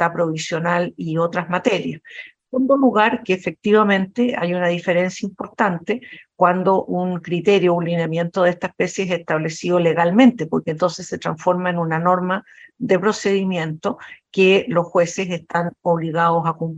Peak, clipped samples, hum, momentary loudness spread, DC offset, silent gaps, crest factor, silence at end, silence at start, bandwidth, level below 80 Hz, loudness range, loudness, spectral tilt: 0 dBFS; under 0.1%; none; 11 LU; under 0.1%; none; 18 dB; 0 s; 0 s; 8.2 kHz; -62 dBFS; 2 LU; -19 LUFS; -6 dB/octave